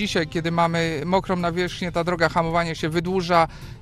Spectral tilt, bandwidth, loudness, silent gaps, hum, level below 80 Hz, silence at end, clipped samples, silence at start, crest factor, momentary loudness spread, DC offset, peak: -5.5 dB/octave; 13.5 kHz; -22 LUFS; none; none; -44 dBFS; 0 s; under 0.1%; 0 s; 18 dB; 5 LU; under 0.1%; -4 dBFS